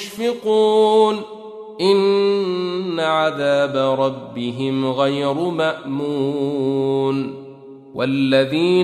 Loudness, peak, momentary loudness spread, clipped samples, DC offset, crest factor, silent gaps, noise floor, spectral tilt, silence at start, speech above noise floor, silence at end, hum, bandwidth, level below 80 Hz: -19 LUFS; -4 dBFS; 12 LU; under 0.1%; under 0.1%; 16 dB; none; -39 dBFS; -6 dB/octave; 0 s; 21 dB; 0 s; none; 13.5 kHz; -64 dBFS